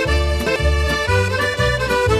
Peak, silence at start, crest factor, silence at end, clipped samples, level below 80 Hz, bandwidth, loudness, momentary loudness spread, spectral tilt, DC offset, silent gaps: -4 dBFS; 0 s; 12 dB; 0 s; under 0.1%; -22 dBFS; 14 kHz; -18 LUFS; 1 LU; -5 dB/octave; 0.2%; none